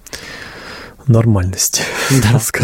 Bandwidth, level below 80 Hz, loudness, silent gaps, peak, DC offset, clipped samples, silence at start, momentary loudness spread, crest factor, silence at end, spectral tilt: 16.5 kHz; -38 dBFS; -14 LUFS; none; 0 dBFS; under 0.1%; under 0.1%; 0.15 s; 18 LU; 14 dB; 0 s; -4.5 dB/octave